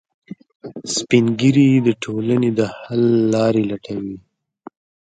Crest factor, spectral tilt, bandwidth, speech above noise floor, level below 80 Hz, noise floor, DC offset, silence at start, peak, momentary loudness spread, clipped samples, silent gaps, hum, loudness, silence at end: 18 dB; -6 dB/octave; 9.4 kHz; 27 dB; -58 dBFS; -43 dBFS; under 0.1%; 0.65 s; 0 dBFS; 18 LU; under 0.1%; none; none; -17 LUFS; 0.95 s